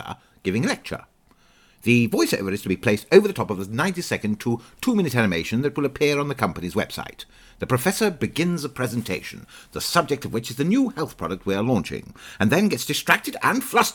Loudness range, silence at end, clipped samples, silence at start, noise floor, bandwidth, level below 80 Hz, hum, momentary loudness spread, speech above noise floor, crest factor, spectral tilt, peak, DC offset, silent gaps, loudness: 3 LU; 0 s; under 0.1%; 0 s; -57 dBFS; 20 kHz; -52 dBFS; none; 13 LU; 35 dB; 24 dB; -5 dB/octave; 0 dBFS; under 0.1%; none; -23 LUFS